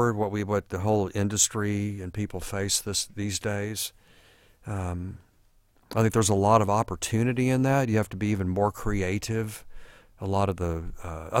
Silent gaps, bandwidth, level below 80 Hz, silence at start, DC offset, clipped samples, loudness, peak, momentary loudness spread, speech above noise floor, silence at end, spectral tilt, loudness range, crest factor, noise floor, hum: none; 16.5 kHz; -48 dBFS; 0 s; under 0.1%; under 0.1%; -27 LUFS; -6 dBFS; 12 LU; 35 dB; 0 s; -5 dB/octave; 6 LU; 20 dB; -62 dBFS; none